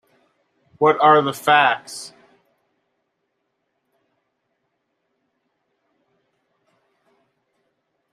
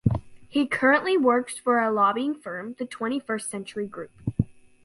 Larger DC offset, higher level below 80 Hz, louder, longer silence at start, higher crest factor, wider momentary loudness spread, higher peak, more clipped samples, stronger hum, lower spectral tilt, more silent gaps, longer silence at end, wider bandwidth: neither; second, -74 dBFS vs -48 dBFS; first, -16 LUFS vs -25 LUFS; first, 0.8 s vs 0.05 s; about the same, 22 dB vs 20 dB; first, 20 LU vs 13 LU; first, -2 dBFS vs -6 dBFS; neither; neither; second, -4 dB/octave vs -5.5 dB/octave; neither; first, 6.05 s vs 0.35 s; first, 14 kHz vs 11.5 kHz